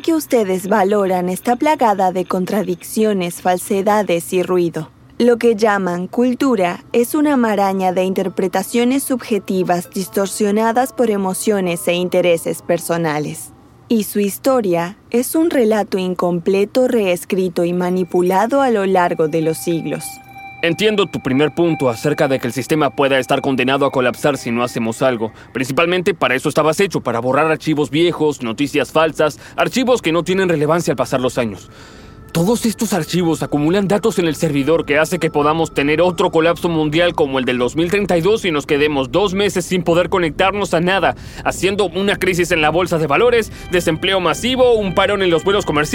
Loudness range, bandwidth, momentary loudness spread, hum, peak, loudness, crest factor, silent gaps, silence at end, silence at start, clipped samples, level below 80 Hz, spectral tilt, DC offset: 2 LU; 17 kHz; 5 LU; none; 0 dBFS; -16 LUFS; 16 dB; none; 0 s; 0.05 s; under 0.1%; -44 dBFS; -5 dB/octave; under 0.1%